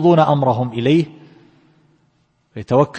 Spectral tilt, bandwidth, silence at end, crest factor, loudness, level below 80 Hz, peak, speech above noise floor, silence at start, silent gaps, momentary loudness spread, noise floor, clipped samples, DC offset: -8.5 dB/octave; 8.6 kHz; 0 s; 16 dB; -16 LUFS; -56 dBFS; -2 dBFS; 47 dB; 0 s; none; 19 LU; -61 dBFS; under 0.1%; under 0.1%